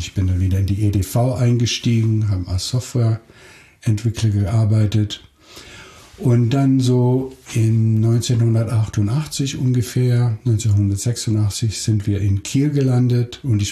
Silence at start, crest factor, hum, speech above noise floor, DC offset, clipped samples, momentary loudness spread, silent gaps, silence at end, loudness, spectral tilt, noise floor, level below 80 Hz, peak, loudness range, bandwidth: 0 s; 12 dB; none; 24 dB; under 0.1%; under 0.1%; 6 LU; none; 0 s; -18 LUFS; -6.5 dB/octave; -41 dBFS; -44 dBFS; -6 dBFS; 3 LU; 13.5 kHz